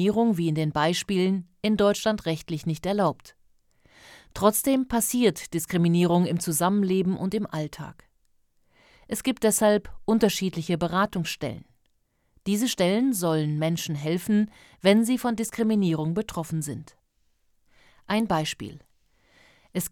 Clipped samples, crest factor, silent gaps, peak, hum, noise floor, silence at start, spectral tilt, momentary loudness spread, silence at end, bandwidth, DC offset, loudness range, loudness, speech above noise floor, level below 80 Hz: under 0.1%; 20 dB; none; -6 dBFS; none; -69 dBFS; 0 s; -5 dB/octave; 11 LU; 0.05 s; 18 kHz; under 0.1%; 4 LU; -25 LUFS; 45 dB; -56 dBFS